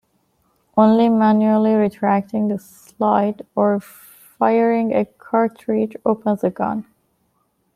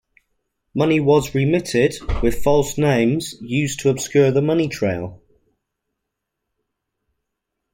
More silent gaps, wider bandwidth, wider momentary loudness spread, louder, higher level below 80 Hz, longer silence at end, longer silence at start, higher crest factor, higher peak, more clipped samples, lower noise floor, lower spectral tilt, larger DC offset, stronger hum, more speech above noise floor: neither; second, 14.5 kHz vs 16.5 kHz; about the same, 9 LU vs 7 LU; about the same, -18 LUFS vs -19 LUFS; second, -62 dBFS vs -36 dBFS; second, 0.95 s vs 2.6 s; about the same, 0.75 s vs 0.75 s; about the same, 16 dB vs 16 dB; about the same, -2 dBFS vs -4 dBFS; neither; second, -66 dBFS vs -79 dBFS; first, -8 dB/octave vs -6 dB/octave; neither; neither; second, 49 dB vs 62 dB